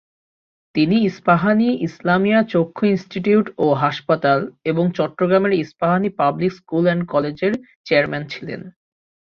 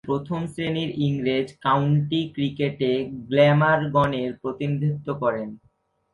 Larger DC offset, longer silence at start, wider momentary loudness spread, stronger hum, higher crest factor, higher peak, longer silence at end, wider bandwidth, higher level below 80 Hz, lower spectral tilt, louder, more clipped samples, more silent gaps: neither; first, 0.75 s vs 0.05 s; about the same, 7 LU vs 9 LU; neither; about the same, 18 dB vs 18 dB; about the same, -2 dBFS vs -4 dBFS; about the same, 0.5 s vs 0.55 s; second, 6.8 kHz vs 11 kHz; about the same, -60 dBFS vs -56 dBFS; about the same, -8 dB/octave vs -8 dB/octave; first, -19 LUFS vs -23 LUFS; neither; first, 7.76-7.84 s vs none